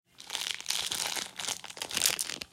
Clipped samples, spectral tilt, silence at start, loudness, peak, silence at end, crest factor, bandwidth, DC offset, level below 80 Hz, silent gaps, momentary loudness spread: under 0.1%; 1 dB/octave; 0.2 s; -31 LUFS; -2 dBFS; 0.05 s; 34 dB; 16.5 kHz; under 0.1%; -68 dBFS; none; 8 LU